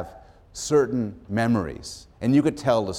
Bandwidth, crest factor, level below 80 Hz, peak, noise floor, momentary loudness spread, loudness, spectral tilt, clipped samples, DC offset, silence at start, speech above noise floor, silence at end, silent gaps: 14.5 kHz; 16 dB; -50 dBFS; -8 dBFS; -46 dBFS; 17 LU; -24 LUFS; -6 dB/octave; under 0.1%; under 0.1%; 0 s; 23 dB; 0 s; none